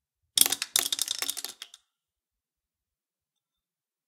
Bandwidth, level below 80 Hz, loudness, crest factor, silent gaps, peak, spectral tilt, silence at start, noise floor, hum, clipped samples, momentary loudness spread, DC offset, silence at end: 18 kHz; -78 dBFS; -25 LUFS; 32 dB; none; -2 dBFS; 2 dB/octave; 0.35 s; under -90 dBFS; none; under 0.1%; 19 LU; under 0.1%; 2.4 s